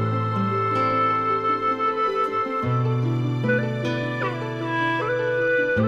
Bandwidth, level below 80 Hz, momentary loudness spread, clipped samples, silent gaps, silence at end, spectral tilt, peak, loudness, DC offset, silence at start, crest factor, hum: 7.6 kHz; -56 dBFS; 5 LU; under 0.1%; none; 0 s; -7.5 dB/octave; -12 dBFS; -23 LUFS; under 0.1%; 0 s; 12 dB; none